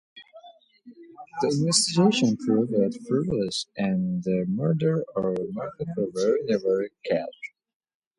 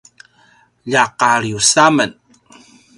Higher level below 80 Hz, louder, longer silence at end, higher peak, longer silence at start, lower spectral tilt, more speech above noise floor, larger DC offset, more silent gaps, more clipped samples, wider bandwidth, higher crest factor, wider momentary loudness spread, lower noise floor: second, -62 dBFS vs -56 dBFS; second, -25 LUFS vs -13 LUFS; second, 0.7 s vs 0.85 s; second, -6 dBFS vs 0 dBFS; second, 0.15 s vs 0.85 s; first, -5 dB/octave vs -2.5 dB/octave; second, 27 dB vs 39 dB; neither; neither; neither; about the same, 11.5 kHz vs 11.5 kHz; about the same, 20 dB vs 18 dB; about the same, 11 LU vs 9 LU; about the same, -51 dBFS vs -53 dBFS